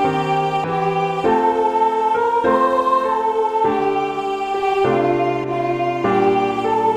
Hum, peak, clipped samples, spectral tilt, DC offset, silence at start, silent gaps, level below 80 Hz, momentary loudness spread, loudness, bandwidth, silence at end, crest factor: none; -4 dBFS; under 0.1%; -6.5 dB/octave; under 0.1%; 0 s; none; -52 dBFS; 4 LU; -18 LUFS; 12 kHz; 0 s; 14 dB